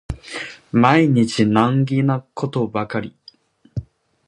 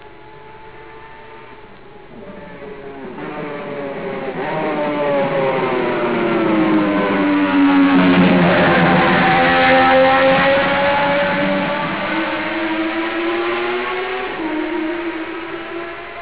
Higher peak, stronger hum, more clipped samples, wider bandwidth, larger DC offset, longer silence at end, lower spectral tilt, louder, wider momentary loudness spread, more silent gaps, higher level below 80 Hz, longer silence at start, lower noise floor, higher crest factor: about the same, 0 dBFS vs -2 dBFS; neither; neither; first, 10.5 kHz vs 4 kHz; second, under 0.1% vs 0.7%; first, 0.45 s vs 0 s; second, -7 dB/octave vs -9.5 dB/octave; about the same, -18 LUFS vs -16 LUFS; first, 18 LU vs 15 LU; neither; about the same, -44 dBFS vs -46 dBFS; about the same, 0.1 s vs 0 s; first, -50 dBFS vs -40 dBFS; about the same, 18 dB vs 14 dB